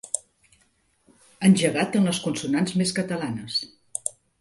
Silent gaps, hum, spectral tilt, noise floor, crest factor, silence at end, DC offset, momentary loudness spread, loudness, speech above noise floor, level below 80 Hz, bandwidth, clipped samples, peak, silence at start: none; none; -4.5 dB/octave; -66 dBFS; 20 dB; 0.3 s; under 0.1%; 11 LU; -24 LUFS; 43 dB; -64 dBFS; 11.5 kHz; under 0.1%; -4 dBFS; 0.05 s